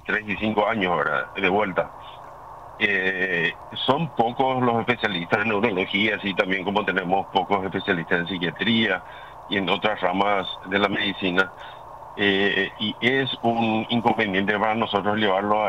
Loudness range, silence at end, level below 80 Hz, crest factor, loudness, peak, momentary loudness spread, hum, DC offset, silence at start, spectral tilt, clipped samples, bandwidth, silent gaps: 2 LU; 0 s; -56 dBFS; 18 dB; -23 LUFS; -6 dBFS; 7 LU; none; 0.1%; 0.05 s; -6.5 dB/octave; under 0.1%; 11 kHz; none